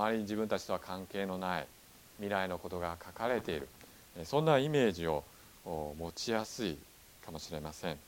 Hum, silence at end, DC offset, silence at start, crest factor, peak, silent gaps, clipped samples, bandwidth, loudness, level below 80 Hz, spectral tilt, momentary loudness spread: none; 0 s; under 0.1%; 0 s; 22 dB; -14 dBFS; none; under 0.1%; 17.5 kHz; -36 LUFS; -60 dBFS; -5 dB/octave; 20 LU